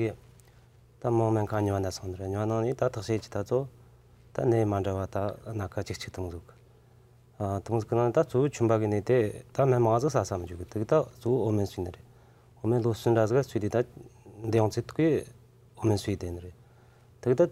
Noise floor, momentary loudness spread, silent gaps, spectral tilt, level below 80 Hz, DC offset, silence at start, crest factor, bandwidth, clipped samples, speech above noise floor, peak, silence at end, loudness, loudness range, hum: -57 dBFS; 11 LU; none; -7.5 dB/octave; -58 dBFS; under 0.1%; 0 s; 18 dB; 14.5 kHz; under 0.1%; 30 dB; -10 dBFS; 0 s; -29 LUFS; 6 LU; none